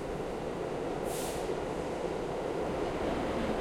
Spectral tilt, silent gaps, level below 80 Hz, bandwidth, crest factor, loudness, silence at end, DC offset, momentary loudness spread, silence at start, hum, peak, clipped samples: -5.5 dB/octave; none; -48 dBFS; 16.5 kHz; 14 dB; -35 LUFS; 0 s; under 0.1%; 4 LU; 0 s; none; -20 dBFS; under 0.1%